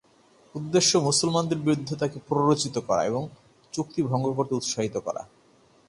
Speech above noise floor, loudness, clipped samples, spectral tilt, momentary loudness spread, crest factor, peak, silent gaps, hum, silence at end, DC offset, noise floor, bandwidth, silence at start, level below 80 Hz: 34 dB; -25 LUFS; under 0.1%; -4.5 dB/octave; 14 LU; 18 dB; -8 dBFS; none; none; 0.65 s; under 0.1%; -59 dBFS; 11.5 kHz; 0.55 s; -62 dBFS